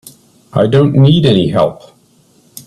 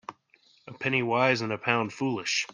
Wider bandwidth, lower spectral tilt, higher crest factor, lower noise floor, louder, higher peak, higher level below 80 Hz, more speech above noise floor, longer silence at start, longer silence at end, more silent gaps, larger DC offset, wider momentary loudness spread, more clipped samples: first, 13.5 kHz vs 10 kHz; first, -7.5 dB/octave vs -4 dB/octave; second, 12 dB vs 22 dB; second, -50 dBFS vs -63 dBFS; first, -11 LUFS vs -27 LUFS; first, 0 dBFS vs -6 dBFS; first, -46 dBFS vs -72 dBFS; first, 40 dB vs 36 dB; first, 0.55 s vs 0.1 s; about the same, 0.05 s vs 0 s; neither; neither; about the same, 8 LU vs 7 LU; neither